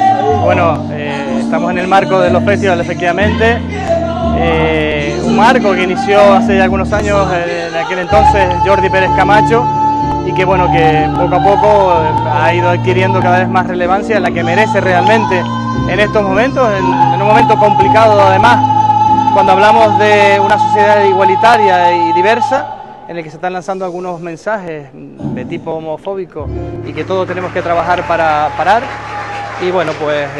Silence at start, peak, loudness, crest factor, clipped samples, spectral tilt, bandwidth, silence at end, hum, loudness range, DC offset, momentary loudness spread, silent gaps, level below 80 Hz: 0 s; 0 dBFS; -10 LUFS; 10 dB; under 0.1%; -6 dB/octave; 11.5 kHz; 0 s; none; 10 LU; under 0.1%; 13 LU; none; -32 dBFS